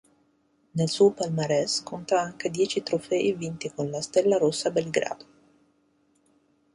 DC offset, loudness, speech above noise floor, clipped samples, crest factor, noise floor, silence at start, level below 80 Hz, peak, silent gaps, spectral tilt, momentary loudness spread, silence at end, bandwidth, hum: under 0.1%; -26 LUFS; 42 dB; under 0.1%; 18 dB; -67 dBFS; 0.75 s; -66 dBFS; -8 dBFS; none; -4.5 dB/octave; 10 LU; 1.6 s; 11.5 kHz; none